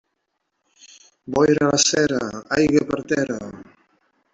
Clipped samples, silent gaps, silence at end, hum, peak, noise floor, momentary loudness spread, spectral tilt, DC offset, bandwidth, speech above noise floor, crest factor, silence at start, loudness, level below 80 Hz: under 0.1%; none; 0.7 s; none; -4 dBFS; -75 dBFS; 10 LU; -3.5 dB/octave; under 0.1%; 8.2 kHz; 56 dB; 18 dB; 1.25 s; -20 LUFS; -54 dBFS